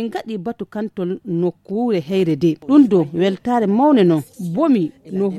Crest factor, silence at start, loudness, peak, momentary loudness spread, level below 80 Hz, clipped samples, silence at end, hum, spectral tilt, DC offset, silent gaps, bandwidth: 16 dB; 0 s; -18 LUFS; -2 dBFS; 13 LU; -60 dBFS; under 0.1%; 0 s; none; -8 dB/octave; under 0.1%; none; 13 kHz